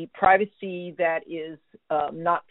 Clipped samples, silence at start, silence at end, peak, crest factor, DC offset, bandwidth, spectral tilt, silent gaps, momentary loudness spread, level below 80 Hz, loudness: under 0.1%; 0 s; 0.1 s; -6 dBFS; 20 dB; under 0.1%; 4 kHz; -3.5 dB/octave; none; 16 LU; -62 dBFS; -25 LUFS